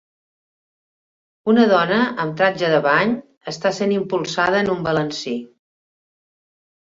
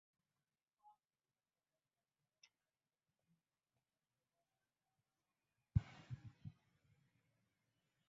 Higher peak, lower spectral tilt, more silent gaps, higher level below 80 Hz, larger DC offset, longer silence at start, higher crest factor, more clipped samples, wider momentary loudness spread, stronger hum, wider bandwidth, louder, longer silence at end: first, -2 dBFS vs -22 dBFS; second, -5.5 dB/octave vs -8 dB/octave; first, 3.37-3.41 s vs none; about the same, -60 dBFS vs -64 dBFS; neither; second, 1.45 s vs 5.75 s; second, 18 dB vs 32 dB; neither; second, 12 LU vs 17 LU; neither; about the same, 7.8 kHz vs 7.4 kHz; first, -19 LUFS vs -47 LUFS; second, 1.35 s vs 1.6 s